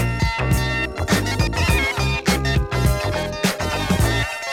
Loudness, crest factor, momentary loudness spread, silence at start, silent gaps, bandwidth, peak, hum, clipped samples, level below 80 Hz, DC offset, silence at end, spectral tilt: -20 LUFS; 16 dB; 4 LU; 0 s; none; 17.5 kHz; -4 dBFS; none; under 0.1%; -26 dBFS; under 0.1%; 0 s; -4.5 dB/octave